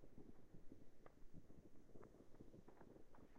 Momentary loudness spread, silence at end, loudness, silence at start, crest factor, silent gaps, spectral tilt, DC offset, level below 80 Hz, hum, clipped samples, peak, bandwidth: 3 LU; 0 s; -68 LUFS; 0 s; 14 dB; none; -7.5 dB/octave; under 0.1%; -68 dBFS; none; under 0.1%; -44 dBFS; 8 kHz